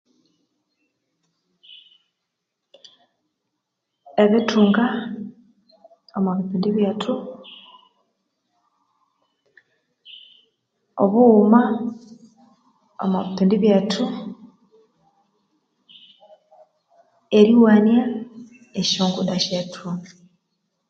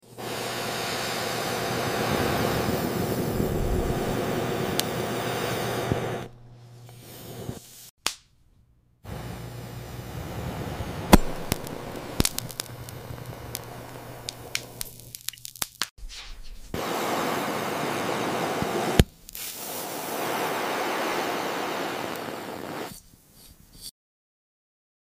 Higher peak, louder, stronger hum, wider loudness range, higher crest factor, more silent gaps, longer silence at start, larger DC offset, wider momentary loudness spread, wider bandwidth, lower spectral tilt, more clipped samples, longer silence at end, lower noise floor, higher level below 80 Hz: about the same, -2 dBFS vs -2 dBFS; first, -19 LUFS vs -29 LUFS; neither; about the same, 9 LU vs 10 LU; second, 22 dB vs 28 dB; second, none vs 7.90-7.97 s, 15.91-15.96 s; first, 4.15 s vs 0.05 s; neither; first, 21 LU vs 15 LU; second, 7.6 kHz vs 16 kHz; first, -6 dB/octave vs -4.5 dB/octave; neither; second, 0.85 s vs 1.1 s; first, -79 dBFS vs -61 dBFS; second, -68 dBFS vs -40 dBFS